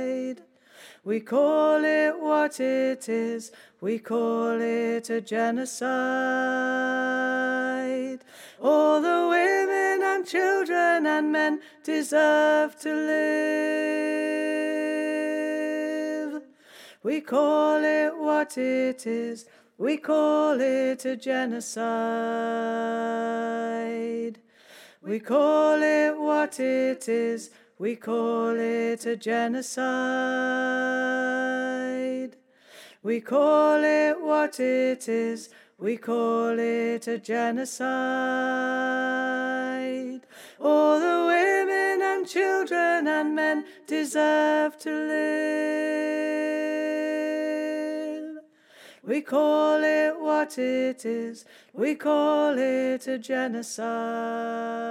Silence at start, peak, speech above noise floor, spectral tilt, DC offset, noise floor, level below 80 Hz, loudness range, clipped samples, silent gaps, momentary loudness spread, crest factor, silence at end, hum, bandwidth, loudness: 0 s; -10 dBFS; 28 dB; -4 dB/octave; under 0.1%; -53 dBFS; -90 dBFS; 4 LU; under 0.1%; none; 10 LU; 16 dB; 0 s; none; 15 kHz; -25 LUFS